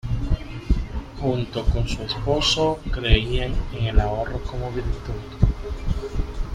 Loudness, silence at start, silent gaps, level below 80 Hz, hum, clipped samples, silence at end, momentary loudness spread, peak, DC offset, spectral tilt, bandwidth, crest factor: -25 LUFS; 0.05 s; none; -26 dBFS; none; under 0.1%; 0 s; 9 LU; -2 dBFS; under 0.1%; -5.5 dB/octave; 10.5 kHz; 20 dB